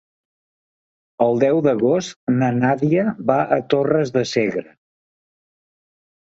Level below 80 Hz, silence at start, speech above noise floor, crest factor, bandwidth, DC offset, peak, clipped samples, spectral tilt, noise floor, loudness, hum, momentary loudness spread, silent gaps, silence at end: -60 dBFS; 1.2 s; over 72 dB; 18 dB; 8 kHz; under 0.1%; -2 dBFS; under 0.1%; -6.5 dB/octave; under -90 dBFS; -19 LUFS; none; 5 LU; 2.16-2.27 s; 1.75 s